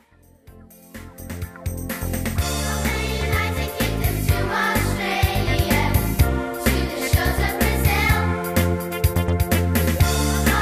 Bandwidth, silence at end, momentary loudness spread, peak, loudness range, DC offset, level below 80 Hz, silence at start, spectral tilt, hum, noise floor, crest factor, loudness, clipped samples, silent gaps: 15.5 kHz; 0 s; 10 LU; -6 dBFS; 5 LU; under 0.1%; -26 dBFS; 0.5 s; -5 dB/octave; none; -50 dBFS; 16 dB; -21 LUFS; under 0.1%; none